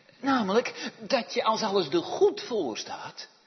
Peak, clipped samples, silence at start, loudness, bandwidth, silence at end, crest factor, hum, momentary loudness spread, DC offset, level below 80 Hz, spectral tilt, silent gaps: -10 dBFS; under 0.1%; 0.2 s; -28 LUFS; 6.4 kHz; 0.2 s; 18 dB; none; 13 LU; under 0.1%; -76 dBFS; -4 dB/octave; none